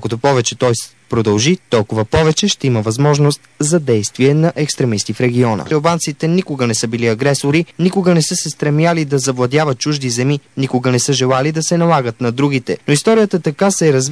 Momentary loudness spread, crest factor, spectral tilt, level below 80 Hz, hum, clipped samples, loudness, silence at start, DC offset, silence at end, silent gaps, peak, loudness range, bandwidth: 4 LU; 14 dB; -5 dB/octave; -46 dBFS; none; under 0.1%; -15 LUFS; 0 s; 0.2%; 0 s; none; 0 dBFS; 1 LU; 11 kHz